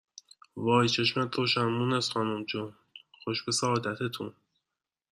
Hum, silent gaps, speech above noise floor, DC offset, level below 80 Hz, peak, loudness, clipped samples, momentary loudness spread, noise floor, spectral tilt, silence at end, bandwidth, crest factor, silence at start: none; none; 60 dB; under 0.1%; -70 dBFS; -10 dBFS; -29 LUFS; under 0.1%; 14 LU; -89 dBFS; -4.5 dB/octave; 0.8 s; 14 kHz; 20 dB; 0.55 s